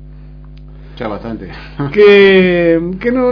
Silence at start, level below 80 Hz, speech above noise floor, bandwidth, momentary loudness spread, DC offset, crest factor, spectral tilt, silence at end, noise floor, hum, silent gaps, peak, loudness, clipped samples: 0 s; -34 dBFS; 22 dB; 5.4 kHz; 20 LU; under 0.1%; 12 dB; -8 dB/octave; 0 s; -33 dBFS; none; none; 0 dBFS; -9 LUFS; 0.5%